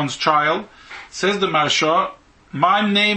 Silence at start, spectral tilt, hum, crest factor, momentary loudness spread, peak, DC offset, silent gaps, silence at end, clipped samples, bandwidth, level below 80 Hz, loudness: 0 s; -3.5 dB/octave; none; 18 dB; 18 LU; -2 dBFS; under 0.1%; none; 0 s; under 0.1%; 8.8 kHz; -58 dBFS; -18 LUFS